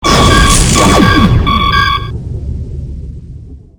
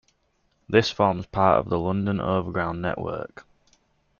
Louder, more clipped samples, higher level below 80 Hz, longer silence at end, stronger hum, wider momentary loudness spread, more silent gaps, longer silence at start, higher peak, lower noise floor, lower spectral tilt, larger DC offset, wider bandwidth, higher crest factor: first, -8 LUFS vs -24 LUFS; first, 0.6% vs under 0.1%; first, -16 dBFS vs -52 dBFS; second, 0.2 s vs 0.8 s; neither; first, 18 LU vs 11 LU; neither; second, 0 s vs 0.7 s; first, 0 dBFS vs -4 dBFS; second, -29 dBFS vs -69 dBFS; second, -4 dB/octave vs -6.5 dB/octave; neither; first, 20 kHz vs 7.2 kHz; second, 10 dB vs 22 dB